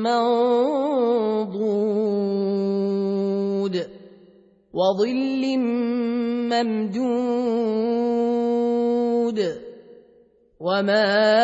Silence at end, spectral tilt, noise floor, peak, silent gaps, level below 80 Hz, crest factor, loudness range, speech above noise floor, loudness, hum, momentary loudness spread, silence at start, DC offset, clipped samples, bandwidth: 0 s; -6.5 dB/octave; -56 dBFS; -6 dBFS; none; -68 dBFS; 16 dB; 2 LU; 36 dB; -22 LUFS; none; 6 LU; 0 s; under 0.1%; under 0.1%; 8 kHz